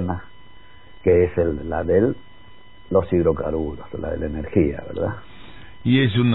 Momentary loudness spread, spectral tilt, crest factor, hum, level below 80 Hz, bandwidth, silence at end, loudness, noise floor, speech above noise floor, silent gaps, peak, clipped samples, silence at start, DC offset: 12 LU; -11.5 dB/octave; 18 dB; none; -40 dBFS; 4.1 kHz; 0 s; -22 LUFS; -48 dBFS; 28 dB; none; -4 dBFS; under 0.1%; 0 s; 1%